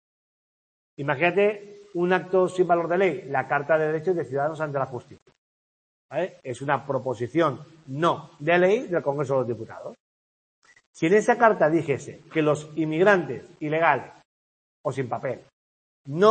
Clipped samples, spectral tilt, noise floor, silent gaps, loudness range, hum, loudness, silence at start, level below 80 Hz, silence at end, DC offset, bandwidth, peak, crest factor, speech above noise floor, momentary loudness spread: under 0.1%; -6.5 dB/octave; under -90 dBFS; 5.22-5.26 s, 5.38-6.09 s, 10.00-10.62 s, 10.86-10.94 s, 14.25-14.84 s, 15.53-16.05 s; 6 LU; none; -24 LUFS; 1 s; -70 dBFS; 0 s; under 0.1%; 8.8 kHz; -4 dBFS; 22 dB; over 66 dB; 14 LU